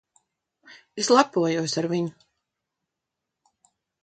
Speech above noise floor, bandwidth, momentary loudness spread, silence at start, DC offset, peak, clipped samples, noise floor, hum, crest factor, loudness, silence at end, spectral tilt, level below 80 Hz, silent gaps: 61 dB; 9.2 kHz; 12 LU; 0.7 s; under 0.1%; -2 dBFS; under 0.1%; -84 dBFS; none; 26 dB; -23 LUFS; 1.9 s; -4.5 dB/octave; -74 dBFS; none